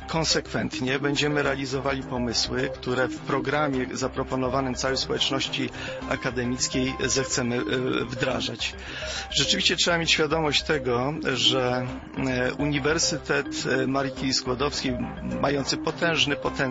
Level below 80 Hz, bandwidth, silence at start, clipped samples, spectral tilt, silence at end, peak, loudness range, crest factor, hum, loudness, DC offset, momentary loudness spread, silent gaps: -44 dBFS; 8 kHz; 0 s; under 0.1%; -3.5 dB/octave; 0 s; -8 dBFS; 4 LU; 18 dB; none; -25 LUFS; under 0.1%; 8 LU; none